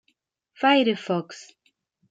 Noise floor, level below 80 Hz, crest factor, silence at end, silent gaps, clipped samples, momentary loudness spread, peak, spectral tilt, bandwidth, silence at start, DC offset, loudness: -72 dBFS; -80 dBFS; 18 dB; 0.7 s; none; under 0.1%; 22 LU; -8 dBFS; -5 dB/octave; 7.8 kHz; 0.6 s; under 0.1%; -22 LUFS